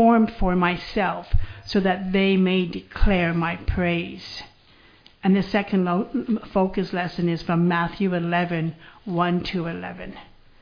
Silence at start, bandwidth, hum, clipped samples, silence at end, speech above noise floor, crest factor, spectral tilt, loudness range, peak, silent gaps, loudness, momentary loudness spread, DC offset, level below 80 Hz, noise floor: 0 s; 5.2 kHz; none; under 0.1%; 0.35 s; 31 dB; 18 dB; -8 dB/octave; 2 LU; -4 dBFS; none; -23 LUFS; 11 LU; under 0.1%; -32 dBFS; -53 dBFS